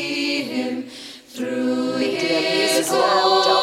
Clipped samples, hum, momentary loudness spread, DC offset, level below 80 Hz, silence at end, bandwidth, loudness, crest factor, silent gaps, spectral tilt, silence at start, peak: under 0.1%; none; 14 LU; under 0.1%; -68 dBFS; 0 s; 16.5 kHz; -20 LUFS; 16 dB; none; -2.5 dB/octave; 0 s; -6 dBFS